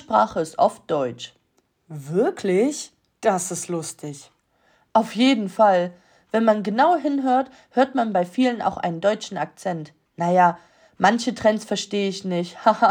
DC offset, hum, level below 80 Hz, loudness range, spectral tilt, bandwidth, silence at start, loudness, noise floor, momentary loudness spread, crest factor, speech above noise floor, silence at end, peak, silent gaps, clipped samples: under 0.1%; none; -66 dBFS; 5 LU; -5 dB/octave; 19.5 kHz; 0.1 s; -22 LUFS; -67 dBFS; 15 LU; 18 dB; 46 dB; 0 s; -4 dBFS; none; under 0.1%